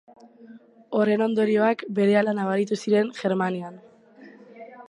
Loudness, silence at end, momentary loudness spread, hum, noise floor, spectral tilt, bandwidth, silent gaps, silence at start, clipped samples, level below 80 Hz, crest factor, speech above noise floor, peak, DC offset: -23 LUFS; 0.05 s; 8 LU; none; -49 dBFS; -6.5 dB/octave; 10.5 kHz; none; 0.4 s; under 0.1%; -76 dBFS; 18 dB; 27 dB; -8 dBFS; under 0.1%